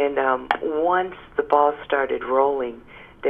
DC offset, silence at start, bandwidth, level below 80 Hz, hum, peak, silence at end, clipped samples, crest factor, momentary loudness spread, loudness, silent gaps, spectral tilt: under 0.1%; 0 s; 5.4 kHz; -54 dBFS; none; -2 dBFS; 0 s; under 0.1%; 20 dB; 9 LU; -22 LUFS; none; -6.5 dB/octave